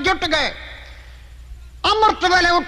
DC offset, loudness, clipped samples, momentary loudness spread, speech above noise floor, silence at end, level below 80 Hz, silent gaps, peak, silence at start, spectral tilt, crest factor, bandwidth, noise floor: under 0.1%; -17 LUFS; under 0.1%; 21 LU; 22 dB; 0 s; -38 dBFS; none; -4 dBFS; 0 s; -3 dB/octave; 16 dB; 13 kHz; -39 dBFS